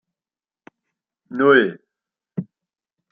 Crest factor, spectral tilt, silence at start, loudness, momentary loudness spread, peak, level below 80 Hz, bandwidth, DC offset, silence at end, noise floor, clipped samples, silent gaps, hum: 22 dB; -9 dB/octave; 1.3 s; -17 LUFS; 18 LU; 0 dBFS; -70 dBFS; 4.6 kHz; under 0.1%; 0.7 s; under -90 dBFS; under 0.1%; none; none